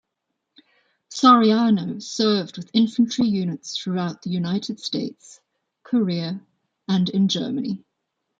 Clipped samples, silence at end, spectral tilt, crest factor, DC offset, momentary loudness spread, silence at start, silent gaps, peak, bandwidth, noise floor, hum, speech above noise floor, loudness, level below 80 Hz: under 0.1%; 0.6 s; -5.5 dB/octave; 20 dB; under 0.1%; 14 LU; 1.1 s; none; -2 dBFS; 7.8 kHz; -79 dBFS; none; 58 dB; -21 LUFS; -68 dBFS